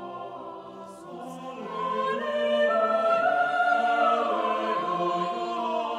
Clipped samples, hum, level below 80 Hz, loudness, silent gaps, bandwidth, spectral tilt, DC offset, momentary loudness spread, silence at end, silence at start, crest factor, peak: under 0.1%; none; -74 dBFS; -25 LUFS; none; 10.5 kHz; -5 dB/octave; under 0.1%; 17 LU; 0 s; 0 s; 16 dB; -12 dBFS